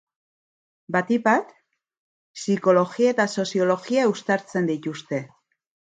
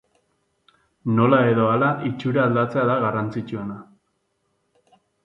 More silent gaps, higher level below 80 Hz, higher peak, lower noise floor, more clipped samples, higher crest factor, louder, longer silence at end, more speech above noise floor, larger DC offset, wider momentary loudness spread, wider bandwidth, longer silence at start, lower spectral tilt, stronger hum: first, 1.98-2.34 s vs none; second, -72 dBFS vs -62 dBFS; about the same, -4 dBFS vs -4 dBFS; first, under -90 dBFS vs -71 dBFS; neither; about the same, 20 dB vs 18 dB; about the same, -23 LUFS vs -21 LUFS; second, 0.75 s vs 1.45 s; first, over 68 dB vs 51 dB; neither; second, 11 LU vs 14 LU; first, 9.4 kHz vs 7 kHz; second, 0.9 s vs 1.05 s; second, -5.5 dB/octave vs -9.5 dB/octave; neither